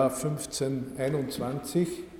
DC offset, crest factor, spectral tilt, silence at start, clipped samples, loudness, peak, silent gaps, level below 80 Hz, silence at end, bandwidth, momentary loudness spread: under 0.1%; 18 dB; -5.5 dB/octave; 0 s; under 0.1%; -31 LUFS; -12 dBFS; none; -56 dBFS; 0 s; 18 kHz; 3 LU